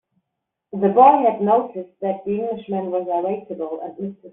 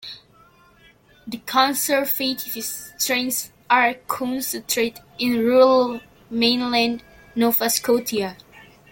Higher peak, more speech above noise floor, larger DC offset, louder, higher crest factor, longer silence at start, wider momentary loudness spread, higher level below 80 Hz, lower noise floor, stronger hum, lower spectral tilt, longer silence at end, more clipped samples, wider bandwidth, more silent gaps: about the same, -2 dBFS vs -4 dBFS; first, 61 dB vs 33 dB; neither; about the same, -19 LUFS vs -20 LUFS; about the same, 18 dB vs 18 dB; first, 0.75 s vs 0.05 s; first, 17 LU vs 13 LU; second, -66 dBFS vs -60 dBFS; first, -80 dBFS vs -53 dBFS; neither; first, -7 dB/octave vs -2 dB/octave; second, 0.05 s vs 0.3 s; neither; second, 3.9 kHz vs 17 kHz; neither